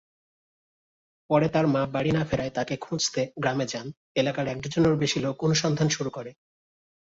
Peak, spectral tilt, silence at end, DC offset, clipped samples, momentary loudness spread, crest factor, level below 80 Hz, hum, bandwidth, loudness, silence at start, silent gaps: -10 dBFS; -5 dB/octave; 0.7 s; under 0.1%; under 0.1%; 8 LU; 18 dB; -56 dBFS; none; 7.8 kHz; -26 LUFS; 1.3 s; 3.97-4.15 s